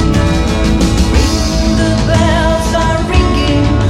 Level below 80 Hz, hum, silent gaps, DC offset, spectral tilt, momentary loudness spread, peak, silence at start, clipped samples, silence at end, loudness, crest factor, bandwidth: -16 dBFS; none; none; under 0.1%; -5.5 dB/octave; 2 LU; 0 dBFS; 0 s; under 0.1%; 0 s; -12 LUFS; 10 dB; 14 kHz